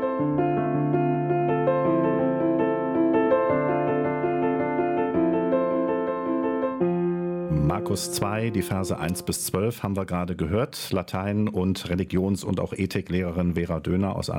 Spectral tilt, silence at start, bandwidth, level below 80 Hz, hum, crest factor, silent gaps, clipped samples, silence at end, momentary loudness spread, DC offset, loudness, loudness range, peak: -6.5 dB/octave; 0 s; 16.5 kHz; -48 dBFS; none; 14 dB; none; under 0.1%; 0 s; 5 LU; under 0.1%; -25 LUFS; 4 LU; -10 dBFS